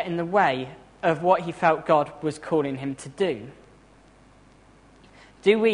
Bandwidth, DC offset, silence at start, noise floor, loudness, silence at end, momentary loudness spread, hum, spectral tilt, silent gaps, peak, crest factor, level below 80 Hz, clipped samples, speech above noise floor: 10.5 kHz; under 0.1%; 0 s; -54 dBFS; -24 LUFS; 0 s; 11 LU; none; -6 dB/octave; none; -4 dBFS; 20 dB; -60 dBFS; under 0.1%; 31 dB